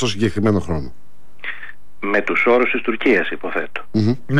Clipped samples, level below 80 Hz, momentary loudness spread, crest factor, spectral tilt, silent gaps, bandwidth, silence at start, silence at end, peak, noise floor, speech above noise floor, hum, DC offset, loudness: under 0.1%; -44 dBFS; 16 LU; 14 dB; -6 dB/octave; none; 12 kHz; 0 s; 0 s; -6 dBFS; -39 dBFS; 21 dB; 50 Hz at -55 dBFS; 5%; -19 LUFS